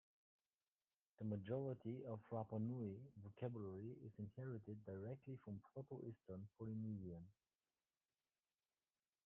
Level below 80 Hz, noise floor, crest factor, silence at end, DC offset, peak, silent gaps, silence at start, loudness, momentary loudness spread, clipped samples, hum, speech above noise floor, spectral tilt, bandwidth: -84 dBFS; under -90 dBFS; 18 dB; 1.95 s; under 0.1%; -34 dBFS; none; 1.2 s; -52 LUFS; 9 LU; under 0.1%; none; over 39 dB; -9 dB/octave; 3.6 kHz